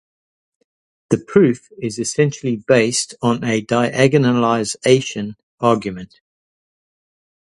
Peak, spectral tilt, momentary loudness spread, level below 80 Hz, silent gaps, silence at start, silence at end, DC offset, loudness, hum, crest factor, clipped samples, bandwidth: 0 dBFS; -5 dB/octave; 11 LU; -56 dBFS; 5.43-5.58 s; 1.1 s; 1.55 s; under 0.1%; -17 LUFS; none; 18 dB; under 0.1%; 11.5 kHz